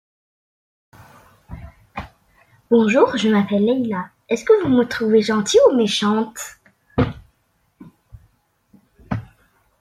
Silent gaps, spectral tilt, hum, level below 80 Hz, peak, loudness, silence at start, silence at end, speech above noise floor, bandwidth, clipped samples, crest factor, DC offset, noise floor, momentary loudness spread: none; -5 dB/octave; none; -48 dBFS; -2 dBFS; -18 LUFS; 1.5 s; 0.6 s; 48 dB; 14 kHz; under 0.1%; 18 dB; under 0.1%; -65 dBFS; 21 LU